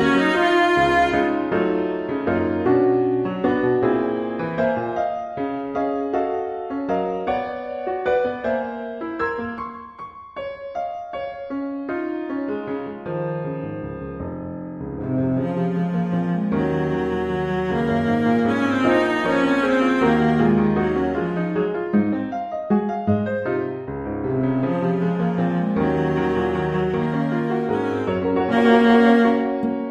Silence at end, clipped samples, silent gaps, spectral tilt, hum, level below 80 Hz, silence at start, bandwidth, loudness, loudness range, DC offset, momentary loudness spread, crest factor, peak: 0 s; under 0.1%; none; -7.5 dB/octave; none; -48 dBFS; 0 s; 9.8 kHz; -21 LUFS; 9 LU; under 0.1%; 12 LU; 18 dB; -4 dBFS